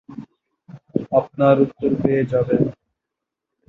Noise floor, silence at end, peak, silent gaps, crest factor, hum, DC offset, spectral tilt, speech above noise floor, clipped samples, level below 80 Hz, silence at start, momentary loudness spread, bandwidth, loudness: -83 dBFS; 0.95 s; -2 dBFS; none; 20 dB; none; under 0.1%; -10.5 dB/octave; 65 dB; under 0.1%; -54 dBFS; 0.1 s; 12 LU; 4.9 kHz; -19 LUFS